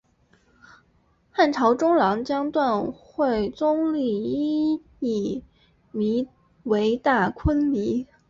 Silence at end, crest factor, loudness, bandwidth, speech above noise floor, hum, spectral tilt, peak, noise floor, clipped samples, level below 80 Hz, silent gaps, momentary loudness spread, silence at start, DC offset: 0.25 s; 16 dB; -23 LUFS; 7.4 kHz; 41 dB; none; -7 dB/octave; -8 dBFS; -63 dBFS; under 0.1%; -44 dBFS; none; 9 LU; 1.35 s; under 0.1%